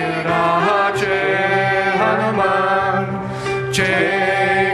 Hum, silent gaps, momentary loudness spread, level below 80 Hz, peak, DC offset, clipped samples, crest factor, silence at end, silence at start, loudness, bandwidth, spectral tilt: none; none; 5 LU; -48 dBFS; -2 dBFS; under 0.1%; under 0.1%; 16 dB; 0 s; 0 s; -17 LUFS; 13.5 kHz; -5 dB/octave